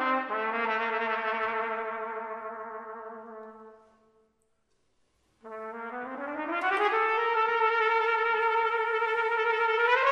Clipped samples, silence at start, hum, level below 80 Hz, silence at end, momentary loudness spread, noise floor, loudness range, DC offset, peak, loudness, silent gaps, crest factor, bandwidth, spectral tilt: under 0.1%; 0 s; none; -76 dBFS; 0 s; 17 LU; -72 dBFS; 18 LU; under 0.1%; -10 dBFS; -28 LUFS; none; 18 dB; 9.2 kHz; -3.5 dB/octave